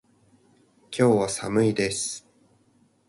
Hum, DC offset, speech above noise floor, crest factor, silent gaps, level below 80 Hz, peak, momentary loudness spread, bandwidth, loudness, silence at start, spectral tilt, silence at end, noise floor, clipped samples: none; under 0.1%; 40 dB; 20 dB; none; -60 dBFS; -6 dBFS; 13 LU; 11.5 kHz; -24 LUFS; 0.9 s; -5 dB/octave; 0.9 s; -63 dBFS; under 0.1%